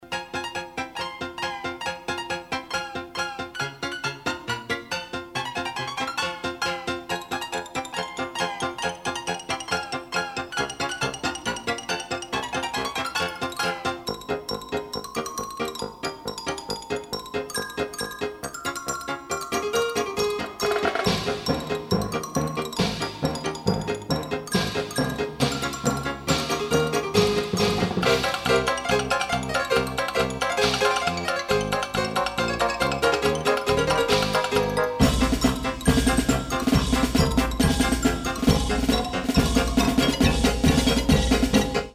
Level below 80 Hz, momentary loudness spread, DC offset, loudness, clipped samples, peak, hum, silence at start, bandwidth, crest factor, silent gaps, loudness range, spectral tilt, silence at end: -36 dBFS; 9 LU; under 0.1%; -25 LUFS; under 0.1%; -4 dBFS; none; 0 s; 16 kHz; 20 dB; none; 8 LU; -4.5 dB/octave; 0 s